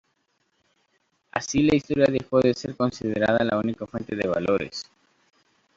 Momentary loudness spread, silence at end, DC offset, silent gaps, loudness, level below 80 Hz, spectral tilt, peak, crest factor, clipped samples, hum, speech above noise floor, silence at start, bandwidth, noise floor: 11 LU; 0.95 s; under 0.1%; none; -24 LUFS; -54 dBFS; -5.5 dB/octave; -6 dBFS; 20 dB; under 0.1%; none; 48 dB; 1.35 s; 7.8 kHz; -71 dBFS